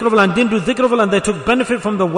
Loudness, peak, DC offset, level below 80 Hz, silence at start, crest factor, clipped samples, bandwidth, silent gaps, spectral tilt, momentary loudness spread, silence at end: -15 LUFS; -2 dBFS; under 0.1%; -44 dBFS; 0 s; 12 dB; under 0.1%; 11 kHz; none; -5 dB/octave; 4 LU; 0 s